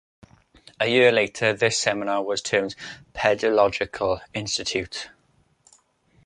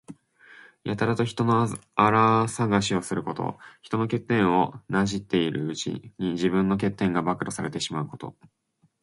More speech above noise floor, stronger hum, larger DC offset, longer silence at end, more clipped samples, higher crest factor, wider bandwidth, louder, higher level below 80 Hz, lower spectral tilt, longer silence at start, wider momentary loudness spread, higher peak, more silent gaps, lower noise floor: first, 41 dB vs 28 dB; neither; neither; first, 1.15 s vs 0.7 s; neither; about the same, 22 dB vs 22 dB; about the same, 11 kHz vs 11.5 kHz; first, -22 LUFS vs -25 LUFS; about the same, -56 dBFS vs -56 dBFS; second, -3 dB/octave vs -5.5 dB/octave; first, 0.8 s vs 0.1 s; first, 15 LU vs 11 LU; about the same, -2 dBFS vs -4 dBFS; neither; first, -64 dBFS vs -53 dBFS